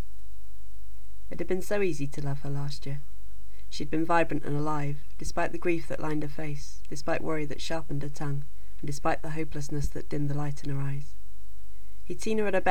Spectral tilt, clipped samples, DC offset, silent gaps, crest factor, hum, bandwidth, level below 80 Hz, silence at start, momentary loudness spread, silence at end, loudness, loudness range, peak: -6 dB/octave; under 0.1%; 8%; none; 22 dB; none; 19.5 kHz; -46 dBFS; 0 s; 24 LU; 0 s; -32 LUFS; 4 LU; -8 dBFS